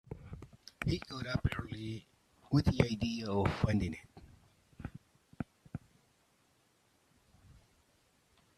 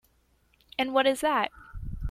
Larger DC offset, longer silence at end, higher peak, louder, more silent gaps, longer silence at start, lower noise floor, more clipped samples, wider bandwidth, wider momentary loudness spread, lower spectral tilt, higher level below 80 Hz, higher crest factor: neither; first, 1.05 s vs 0 s; second, -12 dBFS vs -8 dBFS; second, -36 LUFS vs -27 LUFS; neither; second, 0.1 s vs 0.8 s; first, -72 dBFS vs -67 dBFS; neither; second, 13 kHz vs 16 kHz; about the same, 18 LU vs 16 LU; first, -7 dB/octave vs -4.5 dB/octave; second, -52 dBFS vs -44 dBFS; first, 26 dB vs 20 dB